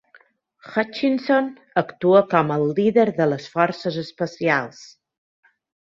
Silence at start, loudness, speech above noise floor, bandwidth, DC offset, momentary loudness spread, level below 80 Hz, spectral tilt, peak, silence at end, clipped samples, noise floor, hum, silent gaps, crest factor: 0.65 s; -21 LUFS; 35 dB; 7.6 kHz; under 0.1%; 10 LU; -66 dBFS; -7 dB/octave; -2 dBFS; 1 s; under 0.1%; -56 dBFS; none; none; 20 dB